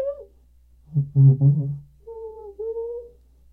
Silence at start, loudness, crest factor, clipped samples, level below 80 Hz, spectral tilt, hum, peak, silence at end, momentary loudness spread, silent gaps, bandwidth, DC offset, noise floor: 0 s; -21 LUFS; 16 dB; under 0.1%; -52 dBFS; -14.5 dB/octave; none; -6 dBFS; 0.45 s; 23 LU; none; 1.2 kHz; under 0.1%; -54 dBFS